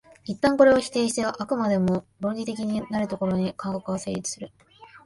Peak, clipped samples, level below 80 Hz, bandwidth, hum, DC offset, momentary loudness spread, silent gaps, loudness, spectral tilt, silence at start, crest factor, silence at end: -4 dBFS; under 0.1%; -56 dBFS; 11.5 kHz; none; under 0.1%; 13 LU; none; -25 LUFS; -5.5 dB/octave; 0.25 s; 20 dB; 0.1 s